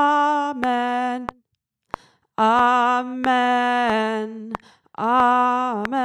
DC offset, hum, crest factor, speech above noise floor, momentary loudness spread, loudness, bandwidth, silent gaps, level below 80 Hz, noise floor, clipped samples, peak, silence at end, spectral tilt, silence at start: under 0.1%; none; 18 dB; 55 dB; 18 LU; -20 LUFS; 12.5 kHz; none; -58 dBFS; -74 dBFS; under 0.1%; -4 dBFS; 0 s; -4.5 dB/octave; 0 s